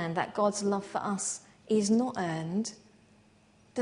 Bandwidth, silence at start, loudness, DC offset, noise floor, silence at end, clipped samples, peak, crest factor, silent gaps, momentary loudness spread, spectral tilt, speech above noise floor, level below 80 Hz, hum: 10.5 kHz; 0 s; -31 LUFS; under 0.1%; -62 dBFS; 0 s; under 0.1%; -14 dBFS; 18 dB; none; 9 LU; -4.5 dB/octave; 32 dB; -72 dBFS; none